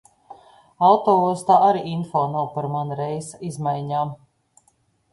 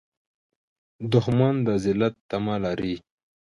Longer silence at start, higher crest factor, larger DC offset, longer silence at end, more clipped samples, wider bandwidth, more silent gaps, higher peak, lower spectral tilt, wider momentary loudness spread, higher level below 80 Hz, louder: second, 0.3 s vs 1 s; about the same, 18 dB vs 18 dB; neither; first, 0.95 s vs 0.45 s; neither; about the same, 11.5 kHz vs 11.5 kHz; second, none vs 2.21-2.29 s; about the same, -4 dBFS vs -6 dBFS; about the same, -7 dB/octave vs -8 dB/octave; first, 12 LU vs 9 LU; second, -64 dBFS vs -54 dBFS; first, -21 LUFS vs -24 LUFS